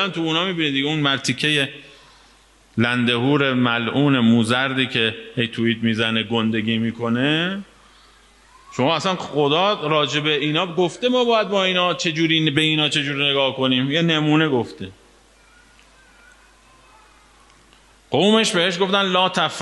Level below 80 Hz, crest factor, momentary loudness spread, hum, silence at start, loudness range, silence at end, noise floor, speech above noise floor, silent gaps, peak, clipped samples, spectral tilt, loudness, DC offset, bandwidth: -60 dBFS; 18 dB; 6 LU; none; 0 s; 5 LU; 0 s; -53 dBFS; 33 dB; none; -2 dBFS; under 0.1%; -5 dB/octave; -19 LUFS; under 0.1%; 11.5 kHz